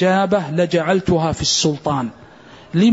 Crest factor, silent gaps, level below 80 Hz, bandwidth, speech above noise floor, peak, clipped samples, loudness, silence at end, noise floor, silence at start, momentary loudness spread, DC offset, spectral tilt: 12 dB; none; -44 dBFS; 8 kHz; 25 dB; -4 dBFS; under 0.1%; -18 LUFS; 0 s; -42 dBFS; 0 s; 7 LU; under 0.1%; -4.5 dB/octave